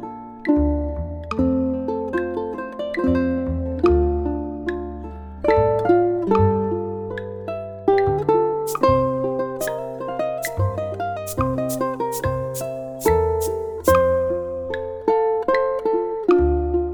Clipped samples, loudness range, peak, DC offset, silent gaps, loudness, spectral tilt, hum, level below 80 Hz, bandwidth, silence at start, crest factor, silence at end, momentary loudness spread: under 0.1%; 3 LU; -2 dBFS; under 0.1%; none; -22 LUFS; -7 dB/octave; none; -34 dBFS; over 20 kHz; 0 s; 18 dB; 0 s; 10 LU